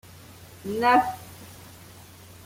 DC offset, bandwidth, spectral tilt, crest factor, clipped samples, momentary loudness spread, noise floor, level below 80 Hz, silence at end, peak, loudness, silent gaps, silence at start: under 0.1%; 16.5 kHz; -4.5 dB/octave; 20 dB; under 0.1%; 26 LU; -47 dBFS; -62 dBFS; 0.8 s; -8 dBFS; -23 LUFS; none; 0.3 s